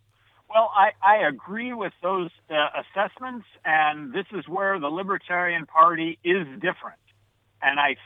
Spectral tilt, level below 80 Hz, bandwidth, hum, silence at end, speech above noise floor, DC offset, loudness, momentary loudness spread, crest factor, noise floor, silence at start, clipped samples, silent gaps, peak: -7 dB/octave; -76 dBFS; 4 kHz; none; 0.1 s; 41 dB; under 0.1%; -23 LUFS; 13 LU; 20 dB; -64 dBFS; 0.5 s; under 0.1%; none; -4 dBFS